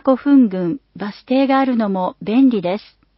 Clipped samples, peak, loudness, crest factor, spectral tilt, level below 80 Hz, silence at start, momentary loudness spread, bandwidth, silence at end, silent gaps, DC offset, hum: under 0.1%; -2 dBFS; -16 LUFS; 14 dB; -12 dB/octave; -60 dBFS; 0.05 s; 13 LU; 5.8 kHz; 0.4 s; none; under 0.1%; none